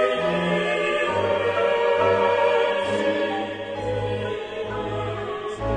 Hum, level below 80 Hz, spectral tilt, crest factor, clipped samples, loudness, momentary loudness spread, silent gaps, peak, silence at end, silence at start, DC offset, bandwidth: none; -46 dBFS; -5.5 dB/octave; 16 dB; under 0.1%; -23 LUFS; 10 LU; none; -8 dBFS; 0 s; 0 s; under 0.1%; 9.8 kHz